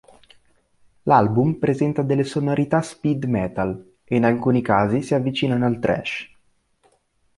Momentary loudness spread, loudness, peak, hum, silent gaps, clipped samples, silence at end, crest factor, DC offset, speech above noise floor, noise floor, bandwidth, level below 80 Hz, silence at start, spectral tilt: 9 LU; -21 LUFS; -2 dBFS; none; none; under 0.1%; 1.1 s; 20 dB; under 0.1%; 44 dB; -64 dBFS; 11.5 kHz; -52 dBFS; 1.05 s; -7.5 dB/octave